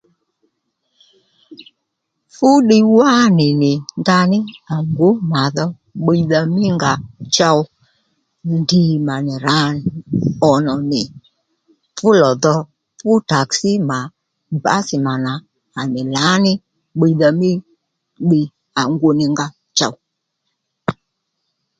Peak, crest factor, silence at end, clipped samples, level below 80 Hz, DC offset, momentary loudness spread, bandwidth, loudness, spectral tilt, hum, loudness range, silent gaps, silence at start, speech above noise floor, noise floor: 0 dBFS; 16 dB; 0.9 s; under 0.1%; -54 dBFS; under 0.1%; 12 LU; 9.2 kHz; -16 LUFS; -5.5 dB/octave; none; 5 LU; none; 1.5 s; 60 dB; -74 dBFS